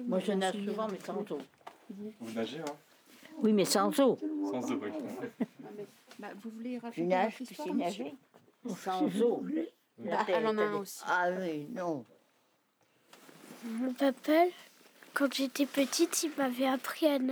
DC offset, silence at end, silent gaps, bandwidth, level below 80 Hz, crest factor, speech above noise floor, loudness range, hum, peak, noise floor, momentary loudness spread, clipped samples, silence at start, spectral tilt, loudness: under 0.1%; 0 s; none; over 20 kHz; under -90 dBFS; 20 dB; 40 dB; 6 LU; none; -14 dBFS; -72 dBFS; 18 LU; under 0.1%; 0 s; -4 dB/octave; -33 LUFS